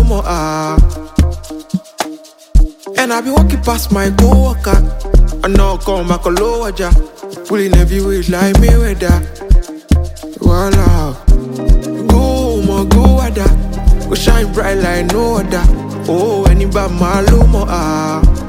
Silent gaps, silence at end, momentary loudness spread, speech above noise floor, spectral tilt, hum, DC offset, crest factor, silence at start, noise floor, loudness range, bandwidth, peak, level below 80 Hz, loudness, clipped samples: none; 0 s; 7 LU; 21 dB; -6 dB/octave; none; under 0.1%; 10 dB; 0 s; -31 dBFS; 2 LU; 16 kHz; 0 dBFS; -12 dBFS; -13 LUFS; under 0.1%